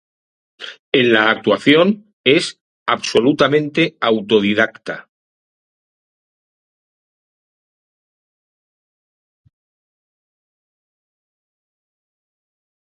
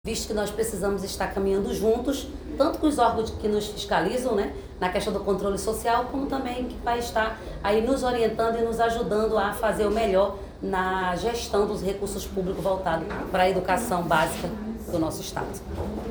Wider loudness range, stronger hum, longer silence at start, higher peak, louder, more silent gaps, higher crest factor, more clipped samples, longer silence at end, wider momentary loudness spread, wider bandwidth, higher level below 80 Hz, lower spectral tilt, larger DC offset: first, 7 LU vs 2 LU; neither; first, 0.6 s vs 0.05 s; first, 0 dBFS vs -8 dBFS; first, -15 LUFS vs -26 LUFS; first, 0.79-0.92 s, 2.13-2.24 s, 2.61-2.86 s vs none; about the same, 20 dB vs 18 dB; neither; first, 7.95 s vs 0 s; first, 17 LU vs 8 LU; second, 11.5 kHz vs over 20 kHz; second, -62 dBFS vs -42 dBFS; about the same, -5 dB/octave vs -5 dB/octave; neither